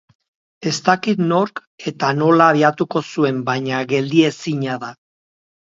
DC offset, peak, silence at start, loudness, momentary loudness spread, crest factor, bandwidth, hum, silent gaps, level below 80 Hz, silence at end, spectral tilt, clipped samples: under 0.1%; 0 dBFS; 0.6 s; -18 LUFS; 13 LU; 18 dB; 7.8 kHz; none; 1.67-1.78 s; -64 dBFS; 0.7 s; -5.5 dB/octave; under 0.1%